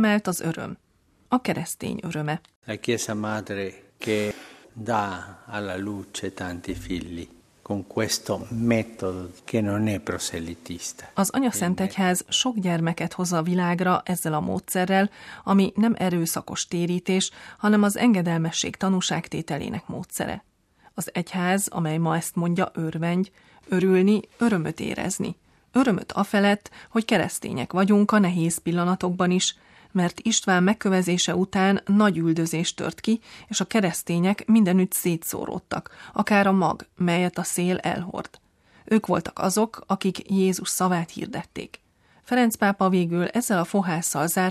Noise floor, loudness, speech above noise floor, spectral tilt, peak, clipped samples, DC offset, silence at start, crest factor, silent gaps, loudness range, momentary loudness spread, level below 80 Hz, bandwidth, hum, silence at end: -51 dBFS; -24 LUFS; 27 dB; -5 dB/octave; -6 dBFS; under 0.1%; under 0.1%; 0 s; 18 dB; 2.56-2.62 s; 6 LU; 13 LU; -58 dBFS; 14.5 kHz; none; 0 s